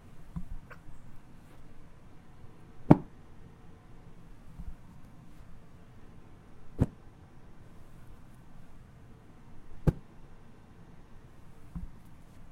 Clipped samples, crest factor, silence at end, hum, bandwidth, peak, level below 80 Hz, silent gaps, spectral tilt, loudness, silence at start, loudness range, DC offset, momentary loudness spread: under 0.1%; 34 dB; 0 s; none; 13 kHz; -2 dBFS; -48 dBFS; none; -9.5 dB/octave; -31 LUFS; 0 s; 9 LU; under 0.1%; 24 LU